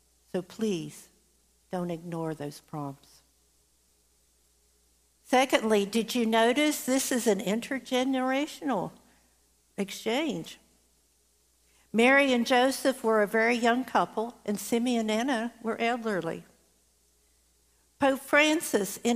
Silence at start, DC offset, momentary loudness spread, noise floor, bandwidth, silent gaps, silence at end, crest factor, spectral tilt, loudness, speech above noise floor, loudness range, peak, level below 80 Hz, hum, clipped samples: 0.35 s; under 0.1%; 14 LU; -68 dBFS; 15.5 kHz; none; 0 s; 20 dB; -3.5 dB/octave; -27 LUFS; 40 dB; 13 LU; -8 dBFS; -70 dBFS; none; under 0.1%